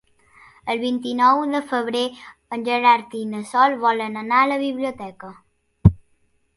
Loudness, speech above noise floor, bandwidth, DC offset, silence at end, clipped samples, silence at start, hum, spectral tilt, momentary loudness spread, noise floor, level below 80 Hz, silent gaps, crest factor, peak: -20 LUFS; 43 dB; 11.5 kHz; under 0.1%; 0.55 s; under 0.1%; 0.65 s; none; -6.5 dB/octave; 15 LU; -63 dBFS; -38 dBFS; none; 22 dB; 0 dBFS